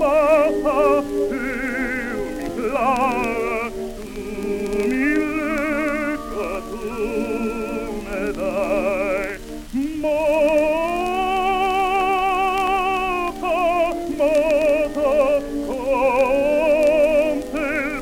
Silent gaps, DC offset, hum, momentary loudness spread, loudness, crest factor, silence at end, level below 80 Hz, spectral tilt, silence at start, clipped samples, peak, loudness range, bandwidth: none; under 0.1%; none; 9 LU; -20 LUFS; 14 dB; 0 s; -40 dBFS; -5 dB/octave; 0 s; under 0.1%; -6 dBFS; 5 LU; 16.5 kHz